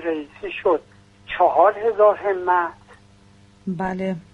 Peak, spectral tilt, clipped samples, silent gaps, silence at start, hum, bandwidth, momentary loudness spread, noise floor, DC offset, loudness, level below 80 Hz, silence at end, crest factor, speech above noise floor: -2 dBFS; -7.5 dB/octave; under 0.1%; none; 0 s; none; 7.6 kHz; 15 LU; -51 dBFS; under 0.1%; -20 LUFS; -56 dBFS; 0.15 s; 18 dB; 32 dB